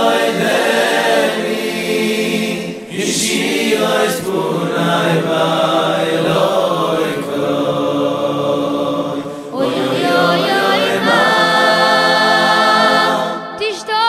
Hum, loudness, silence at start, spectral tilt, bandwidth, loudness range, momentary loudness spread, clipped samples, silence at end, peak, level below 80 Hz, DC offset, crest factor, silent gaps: none; -14 LUFS; 0 s; -4 dB/octave; 16 kHz; 5 LU; 8 LU; under 0.1%; 0 s; 0 dBFS; -60 dBFS; under 0.1%; 14 dB; none